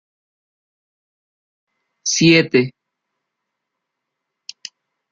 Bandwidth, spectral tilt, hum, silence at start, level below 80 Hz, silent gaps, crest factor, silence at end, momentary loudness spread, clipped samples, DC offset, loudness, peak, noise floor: 7.6 kHz; -4 dB/octave; none; 2.05 s; -62 dBFS; none; 22 dB; 2.4 s; 24 LU; under 0.1%; under 0.1%; -15 LUFS; -2 dBFS; -79 dBFS